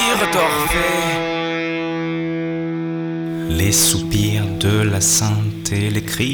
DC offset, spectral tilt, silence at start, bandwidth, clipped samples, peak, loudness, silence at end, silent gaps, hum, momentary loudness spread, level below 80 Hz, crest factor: under 0.1%; -3.5 dB/octave; 0 s; over 20 kHz; under 0.1%; -4 dBFS; -18 LUFS; 0 s; none; none; 9 LU; -36 dBFS; 14 dB